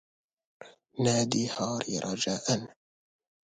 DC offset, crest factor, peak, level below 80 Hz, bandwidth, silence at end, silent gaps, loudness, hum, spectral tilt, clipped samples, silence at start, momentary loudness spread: under 0.1%; 22 dB; -10 dBFS; -66 dBFS; 9.6 kHz; 0.75 s; none; -30 LUFS; none; -4 dB/octave; under 0.1%; 0.6 s; 6 LU